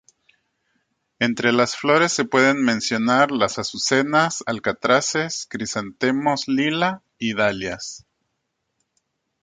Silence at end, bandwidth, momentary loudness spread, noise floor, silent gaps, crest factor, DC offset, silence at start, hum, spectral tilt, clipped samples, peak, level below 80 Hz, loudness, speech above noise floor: 1.45 s; 9.6 kHz; 10 LU; -76 dBFS; none; 18 dB; under 0.1%; 1.2 s; none; -3.5 dB/octave; under 0.1%; -4 dBFS; -60 dBFS; -20 LUFS; 55 dB